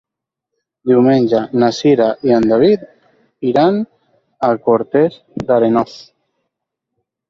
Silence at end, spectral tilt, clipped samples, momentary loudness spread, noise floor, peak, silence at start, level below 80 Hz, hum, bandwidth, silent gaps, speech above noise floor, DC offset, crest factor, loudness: 1.25 s; -7 dB/octave; under 0.1%; 10 LU; -80 dBFS; -2 dBFS; 0.85 s; -54 dBFS; none; 7.4 kHz; none; 67 dB; under 0.1%; 14 dB; -14 LUFS